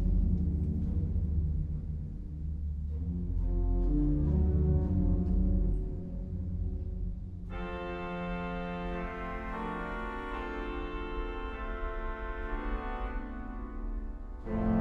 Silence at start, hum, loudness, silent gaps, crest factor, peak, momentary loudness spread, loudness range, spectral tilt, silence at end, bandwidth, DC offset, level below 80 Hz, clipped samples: 0 s; none; -35 LUFS; none; 14 dB; -18 dBFS; 11 LU; 8 LU; -9.5 dB/octave; 0 s; 4.2 kHz; under 0.1%; -34 dBFS; under 0.1%